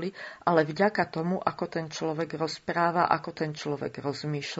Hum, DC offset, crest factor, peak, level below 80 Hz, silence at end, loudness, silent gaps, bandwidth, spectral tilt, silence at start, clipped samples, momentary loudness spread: none; under 0.1%; 22 dB; -6 dBFS; -68 dBFS; 0 s; -29 LUFS; none; 8 kHz; -4.5 dB/octave; 0 s; under 0.1%; 8 LU